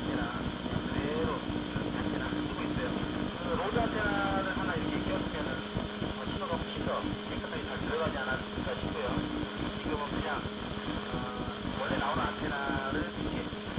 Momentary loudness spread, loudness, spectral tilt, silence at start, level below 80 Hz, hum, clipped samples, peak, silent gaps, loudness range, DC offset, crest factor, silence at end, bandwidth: 5 LU; -34 LUFS; -4 dB/octave; 0 s; -46 dBFS; none; under 0.1%; -16 dBFS; none; 2 LU; under 0.1%; 18 dB; 0 s; 4 kHz